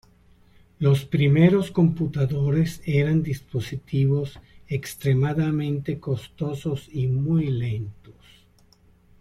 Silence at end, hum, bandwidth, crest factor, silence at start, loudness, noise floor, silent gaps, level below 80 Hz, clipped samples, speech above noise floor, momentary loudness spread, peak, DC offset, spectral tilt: 1.25 s; none; 13.5 kHz; 20 dB; 0.8 s; -24 LUFS; -57 dBFS; none; -50 dBFS; under 0.1%; 34 dB; 11 LU; -4 dBFS; under 0.1%; -8 dB/octave